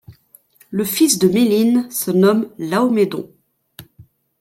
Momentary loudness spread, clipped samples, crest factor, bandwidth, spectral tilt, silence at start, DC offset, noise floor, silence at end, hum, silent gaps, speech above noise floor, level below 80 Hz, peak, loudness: 10 LU; under 0.1%; 16 dB; 16.5 kHz; -5 dB/octave; 0.1 s; under 0.1%; -51 dBFS; 0.4 s; none; none; 36 dB; -60 dBFS; -2 dBFS; -16 LUFS